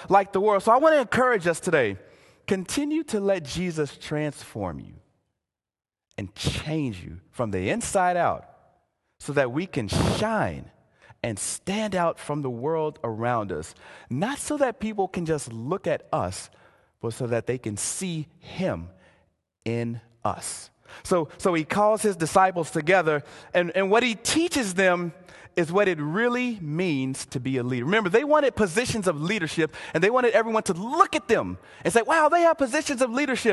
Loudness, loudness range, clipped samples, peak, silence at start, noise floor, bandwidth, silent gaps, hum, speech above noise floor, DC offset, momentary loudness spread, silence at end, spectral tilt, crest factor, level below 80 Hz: -25 LUFS; 8 LU; under 0.1%; -4 dBFS; 0 s; -86 dBFS; 12.5 kHz; none; none; 62 dB; under 0.1%; 13 LU; 0 s; -4.5 dB/octave; 22 dB; -50 dBFS